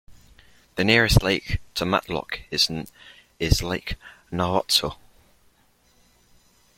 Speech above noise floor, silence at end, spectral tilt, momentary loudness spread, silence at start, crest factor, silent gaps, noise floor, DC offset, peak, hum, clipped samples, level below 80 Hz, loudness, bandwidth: 38 dB; 1.85 s; -4 dB/octave; 16 LU; 0.1 s; 24 dB; none; -61 dBFS; under 0.1%; -2 dBFS; none; under 0.1%; -36 dBFS; -23 LUFS; 16.5 kHz